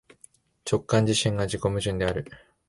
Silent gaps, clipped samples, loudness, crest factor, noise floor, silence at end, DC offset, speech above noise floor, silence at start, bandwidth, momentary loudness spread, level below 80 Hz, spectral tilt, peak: none; under 0.1%; -26 LUFS; 18 dB; -57 dBFS; 0.3 s; under 0.1%; 32 dB; 0.65 s; 11.5 kHz; 12 LU; -46 dBFS; -5 dB/octave; -8 dBFS